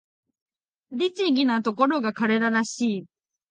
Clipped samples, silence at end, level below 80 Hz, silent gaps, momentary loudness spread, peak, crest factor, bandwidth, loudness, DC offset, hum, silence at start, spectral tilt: under 0.1%; 0.45 s; -78 dBFS; none; 6 LU; -6 dBFS; 18 dB; 9.6 kHz; -24 LUFS; under 0.1%; none; 0.9 s; -4.5 dB/octave